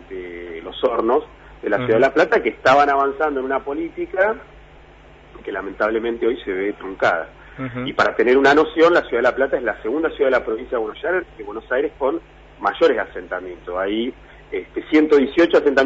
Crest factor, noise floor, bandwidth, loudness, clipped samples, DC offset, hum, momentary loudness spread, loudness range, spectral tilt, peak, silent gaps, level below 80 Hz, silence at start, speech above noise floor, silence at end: 14 dB; -45 dBFS; 8 kHz; -19 LUFS; under 0.1%; under 0.1%; none; 15 LU; 6 LU; -5.5 dB/octave; -4 dBFS; none; -48 dBFS; 0 s; 26 dB; 0 s